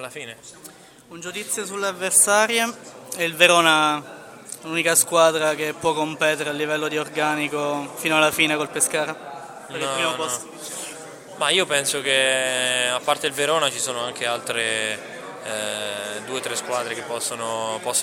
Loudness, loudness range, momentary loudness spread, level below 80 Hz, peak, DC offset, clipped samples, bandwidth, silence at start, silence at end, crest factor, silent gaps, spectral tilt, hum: -21 LUFS; 6 LU; 18 LU; -68 dBFS; 0 dBFS; under 0.1%; under 0.1%; 16.5 kHz; 0 s; 0 s; 22 dB; none; -1.5 dB/octave; none